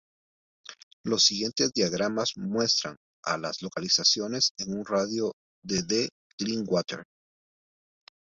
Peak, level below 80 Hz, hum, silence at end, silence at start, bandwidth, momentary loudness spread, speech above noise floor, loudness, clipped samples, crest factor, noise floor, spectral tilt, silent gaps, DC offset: -8 dBFS; -66 dBFS; none; 1.25 s; 0.7 s; 8 kHz; 16 LU; over 62 dB; -27 LUFS; under 0.1%; 22 dB; under -90 dBFS; -3 dB/octave; 0.83-1.04 s, 2.97-3.23 s, 4.51-4.55 s, 5.33-5.62 s, 6.12-6.38 s; under 0.1%